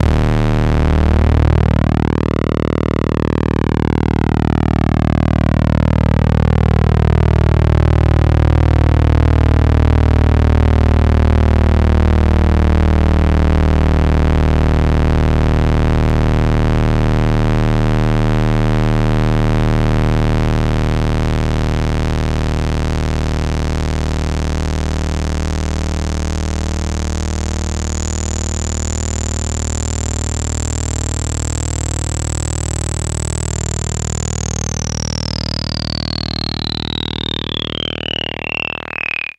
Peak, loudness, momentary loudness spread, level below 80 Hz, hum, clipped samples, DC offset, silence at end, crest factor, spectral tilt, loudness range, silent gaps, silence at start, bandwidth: 0 dBFS; -16 LUFS; 7 LU; -18 dBFS; none; under 0.1%; under 0.1%; 0.15 s; 14 dB; -6 dB/octave; 7 LU; none; 0 s; 10 kHz